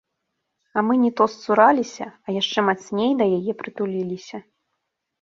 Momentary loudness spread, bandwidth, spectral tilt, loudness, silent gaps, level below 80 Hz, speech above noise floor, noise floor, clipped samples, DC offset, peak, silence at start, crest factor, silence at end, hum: 14 LU; 7.6 kHz; -5.5 dB/octave; -21 LUFS; none; -68 dBFS; 57 dB; -78 dBFS; under 0.1%; under 0.1%; -2 dBFS; 0.75 s; 20 dB; 0.8 s; none